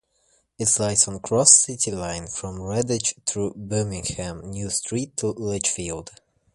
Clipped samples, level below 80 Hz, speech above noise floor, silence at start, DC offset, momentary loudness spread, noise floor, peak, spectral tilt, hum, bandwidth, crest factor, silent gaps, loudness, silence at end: under 0.1%; -48 dBFS; 42 dB; 0.6 s; under 0.1%; 17 LU; -65 dBFS; 0 dBFS; -3 dB/octave; none; 11.5 kHz; 24 dB; none; -21 LUFS; 0.45 s